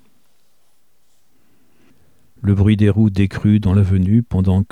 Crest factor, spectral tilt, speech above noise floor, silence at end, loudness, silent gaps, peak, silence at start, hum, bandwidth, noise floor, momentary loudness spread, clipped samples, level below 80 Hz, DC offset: 16 dB; -9.5 dB/octave; 50 dB; 0.05 s; -16 LUFS; none; -2 dBFS; 2.45 s; none; 8.8 kHz; -64 dBFS; 4 LU; under 0.1%; -40 dBFS; 0.4%